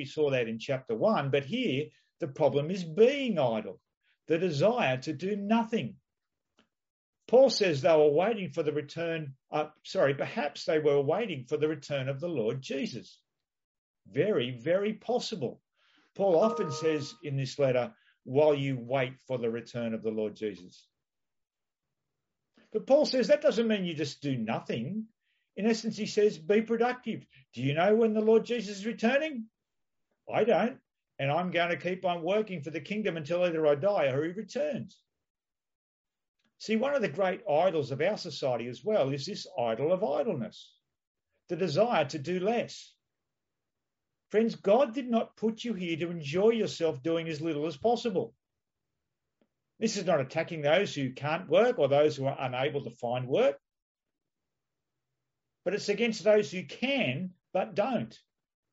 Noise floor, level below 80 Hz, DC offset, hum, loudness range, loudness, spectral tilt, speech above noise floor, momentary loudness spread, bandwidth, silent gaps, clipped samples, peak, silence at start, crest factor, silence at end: -89 dBFS; -76 dBFS; under 0.1%; none; 5 LU; -30 LUFS; -4.5 dB/octave; 60 dB; 11 LU; 8 kHz; 3.97-4.01 s, 6.90-7.13 s, 13.64-13.94 s, 35.30-35.35 s, 35.75-36.05 s, 36.28-36.35 s, 41.07-41.15 s, 53.82-53.95 s; under 0.1%; -12 dBFS; 0 s; 18 dB; 0.55 s